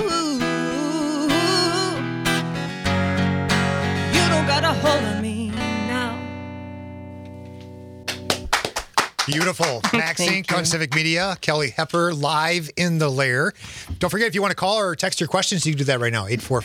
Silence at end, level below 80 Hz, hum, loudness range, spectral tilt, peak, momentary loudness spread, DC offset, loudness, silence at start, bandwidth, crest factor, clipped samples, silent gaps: 0 s; -48 dBFS; none; 6 LU; -4 dB/octave; -2 dBFS; 14 LU; under 0.1%; -21 LUFS; 0 s; 18.5 kHz; 20 dB; under 0.1%; none